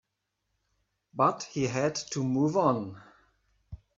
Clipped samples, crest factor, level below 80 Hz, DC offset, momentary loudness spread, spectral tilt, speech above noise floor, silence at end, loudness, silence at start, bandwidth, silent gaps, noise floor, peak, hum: under 0.1%; 22 dB; -62 dBFS; under 0.1%; 8 LU; -5.5 dB/octave; 54 dB; 0.2 s; -28 LUFS; 1.15 s; 7.8 kHz; none; -82 dBFS; -10 dBFS; 50 Hz at -65 dBFS